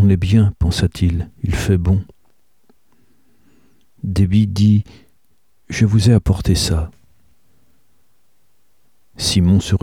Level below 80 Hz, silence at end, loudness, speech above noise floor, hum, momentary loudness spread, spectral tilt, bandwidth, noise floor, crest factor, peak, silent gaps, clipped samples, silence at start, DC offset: -30 dBFS; 0.05 s; -16 LUFS; 51 dB; none; 10 LU; -6 dB/octave; 14 kHz; -65 dBFS; 16 dB; -2 dBFS; none; under 0.1%; 0 s; 0.3%